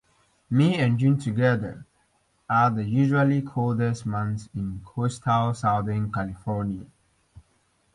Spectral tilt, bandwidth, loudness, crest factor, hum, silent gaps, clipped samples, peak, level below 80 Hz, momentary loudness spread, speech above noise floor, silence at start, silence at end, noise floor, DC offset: -7.5 dB/octave; 11 kHz; -25 LUFS; 18 dB; none; none; under 0.1%; -8 dBFS; -52 dBFS; 11 LU; 43 dB; 0.5 s; 0.55 s; -67 dBFS; under 0.1%